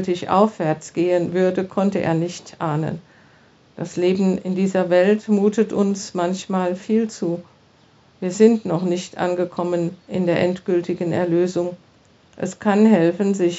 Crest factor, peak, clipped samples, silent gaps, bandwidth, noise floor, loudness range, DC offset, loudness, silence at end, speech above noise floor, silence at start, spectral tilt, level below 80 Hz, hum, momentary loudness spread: 18 dB; -2 dBFS; under 0.1%; none; 8 kHz; -54 dBFS; 3 LU; under 0.1%; -20 LUFS; 0 s; 34 dB; 0 s; -6.5 dB/octave; -64 dBFS; none; 10 LU